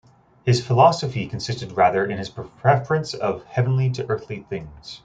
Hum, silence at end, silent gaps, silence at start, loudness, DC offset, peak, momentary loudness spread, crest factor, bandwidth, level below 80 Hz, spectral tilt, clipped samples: none; 0.1 s; none; 0.45 s; -22 LUFS; under 0.1%; -2 dBFS; 15 LU; 20 dB; 8.8 kHz; -54 dBFS; -6 dB/octave; under 0.1%